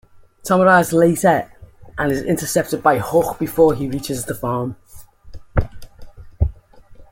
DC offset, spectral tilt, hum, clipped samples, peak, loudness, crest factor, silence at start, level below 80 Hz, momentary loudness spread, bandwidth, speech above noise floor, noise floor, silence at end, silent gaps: under 0.1%; -5.5 dB/octave; none; under 0.1%; -2 dBFS; -18 LUFS; 18 dB; 0.45 s; -34 dBFS; 12 LU; 17 kHz; 26 dB; -43 dBFS; 0.1 s; none